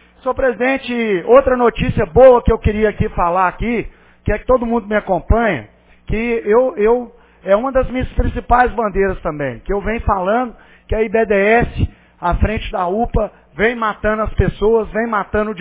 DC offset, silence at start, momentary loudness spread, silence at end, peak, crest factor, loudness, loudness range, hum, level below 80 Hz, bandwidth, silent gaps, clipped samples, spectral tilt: under 0.1%; 0.25 s; 10 LU; 0 s; 0 dBFS; 16 dB; -16 LUFS; 4 LU; none; -26 dBFS; 4 kHz; none; under 0.1%; -10.5 dB/octave